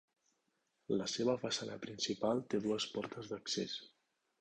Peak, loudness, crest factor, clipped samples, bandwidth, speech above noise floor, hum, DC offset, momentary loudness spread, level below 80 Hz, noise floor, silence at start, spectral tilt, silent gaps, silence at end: -22 dBFS; -39 LUFS; 18 dB; under 0.1%; 10 kHz; 44 dB; none; under 0.1%; 9 LU; -76 dBFS; -82 dBFS; 0.9 s; -4 dB/octave; none; 0.55 s